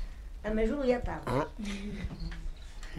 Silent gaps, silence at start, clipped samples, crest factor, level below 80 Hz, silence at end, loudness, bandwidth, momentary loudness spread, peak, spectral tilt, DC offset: none; 0 s; under 0.1%; 18 dB; -40 dBFS; 0 s; -34 LUFS; 13 kHz; 16 LU; -16 dBFS; -6.5 dB/octave; under 0.1%